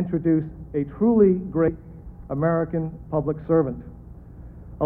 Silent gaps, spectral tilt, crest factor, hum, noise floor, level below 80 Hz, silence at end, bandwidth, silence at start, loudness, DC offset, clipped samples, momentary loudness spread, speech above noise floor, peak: none; -13 dB/octave; 18 dB; none; -42 dBFS; -44 dBFS; 0 s; 2.8 kHz; 0 s; -23 LUFS; under 0.1%; under 0.1%; 24 LU; 19 dB; -6 dBFS